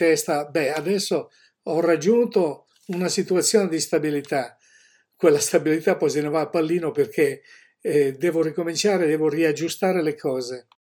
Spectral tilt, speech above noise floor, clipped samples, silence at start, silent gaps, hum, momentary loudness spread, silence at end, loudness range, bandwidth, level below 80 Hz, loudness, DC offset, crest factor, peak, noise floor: -4.5 dB/octave; 36 dB; under 0.1%; 0 s; none; none; 8 LU; 0.25 s; 1 LU; 18 kHz; -76 dBFS; -22 LUFS; under 0.1%; 18 dB; -4 dBFS; -58 dBFS